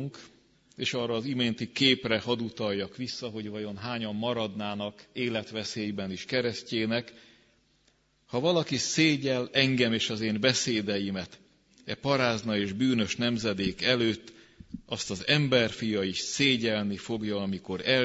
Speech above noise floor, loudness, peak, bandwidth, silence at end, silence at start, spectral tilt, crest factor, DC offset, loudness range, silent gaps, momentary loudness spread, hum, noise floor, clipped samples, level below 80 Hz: 39 dB; -28 LUFS; -8 dBFS; 8 kHz; 0 s; 0 s; -4 dB/octave; 20 dB; under 0.1%; 6 LU; none; 12 LU; none; -68 dBFS; under 0.1%; -64 dBFS